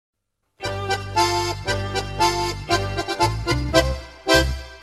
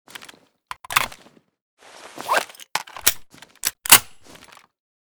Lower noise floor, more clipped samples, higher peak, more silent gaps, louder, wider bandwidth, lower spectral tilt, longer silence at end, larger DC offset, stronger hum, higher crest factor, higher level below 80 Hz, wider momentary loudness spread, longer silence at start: about the same, -51 dBFS vs -52 dBFS; neither; about the same, -2 dBFS vs 0 dBFS; second, none vs 1.62-1.77 s; second, -22 LUFS vs -19 LUFS; second, 15.5 kHz vs over 20 kHz; first, -4 dB/octave vs 0.5 dB/octave; second, 0 s vs 1 s; neither; neither; about the same, 20 dB vs 24 dB; first, -32 dBFS vs -56 dBFS; second, 9 LU vs 27 LU; second, 0.6 s vs 0.9 s